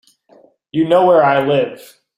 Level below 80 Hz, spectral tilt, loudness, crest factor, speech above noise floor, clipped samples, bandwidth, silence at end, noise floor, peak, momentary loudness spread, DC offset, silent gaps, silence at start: -60 dBFS; -7 dB/octave; -14 LUFS; 14 dB; 37 dB; under 0.1%; 15.5 kHz; 0.4 s; -50 dBFS; -2 dBFS; 12 LU; under 0.1%; none; 0.75 s